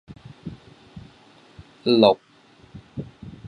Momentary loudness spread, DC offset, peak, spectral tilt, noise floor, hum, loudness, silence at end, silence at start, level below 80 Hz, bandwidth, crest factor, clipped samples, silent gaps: 28 LU; under 0.1%; -2 dBFS; -7.5 dB/octave; -53 dBFS; none; -19 LUFS; 0 s; 0.45 s; -56 dBFS; 10 kHz; 24 dB; under 0.1%; none